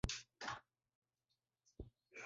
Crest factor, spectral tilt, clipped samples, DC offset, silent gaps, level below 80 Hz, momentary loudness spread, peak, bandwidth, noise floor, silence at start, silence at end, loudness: 28 dB; -3 dB/octave; under 0.1%; under 0.1%; 0.95-1.02 s; -60 dBFS; 13 LU; -24 dBFS; 7.6 kHz; under -90 dBFS; 0.05 s; 0 s; -51 LUFS